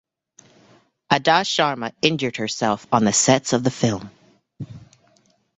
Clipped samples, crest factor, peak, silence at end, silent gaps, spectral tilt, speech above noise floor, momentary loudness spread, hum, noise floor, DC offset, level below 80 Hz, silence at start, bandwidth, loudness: under 0.1%; 20 dB; -2 dBFS; 0.75 s; none; -3.5 dB/octave; 41 dB; 18 LU; none; -61 dBFS; under 0.1%; -58 dBFS; 1.1 s; 8.4 kHz; -20 LUFS